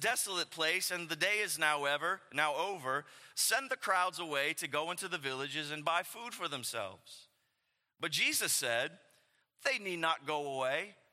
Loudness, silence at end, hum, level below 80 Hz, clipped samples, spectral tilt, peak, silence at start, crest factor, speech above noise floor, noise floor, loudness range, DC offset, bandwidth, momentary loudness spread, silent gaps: -34 LUFS; 0.2 s; none; -90 dBFS; under 0.1%; -1 dB/octave; -14 dBFS; 0 s; 22 dB; 47 dB; -82 dBFS; 4 LU; under 0.1%; 16.5 kHz; 8 LU; none